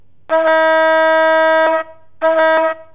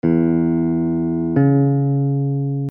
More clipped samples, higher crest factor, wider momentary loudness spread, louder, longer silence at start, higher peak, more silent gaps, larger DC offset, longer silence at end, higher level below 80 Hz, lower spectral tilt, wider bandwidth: neither; about the same, 10 dB vs 12 dB; first, 8 LU vs 5 LU; first, -13 LUFS vs -18 LUFS; first, 0.3 s vs 0.05 s; about the same, -4 dBFS vs -4 dBFS; neither; first, 0.9% vs under 0.1%; about the same, 0.1 s vs 0 s; second, -64 dBFS vs -48 dBFS; second, -6 dB/octave vs -13.5 dB/octave; first, 4 kHz vs 2.8 kHz